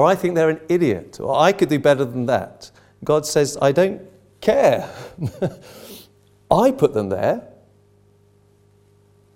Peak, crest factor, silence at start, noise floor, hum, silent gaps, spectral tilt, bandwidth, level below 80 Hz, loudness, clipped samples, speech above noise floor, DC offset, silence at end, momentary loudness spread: 0 dBFS; 20 dB; 0 s; -55 dBFS; 50 Hz at -50 dBFS; none; -5.5 dB/octave; 16.5 kHz; -54 dBFS; -19 LUFS; under 0.1%; 37 dB; under 0.1%; 1.9 s; 15 LU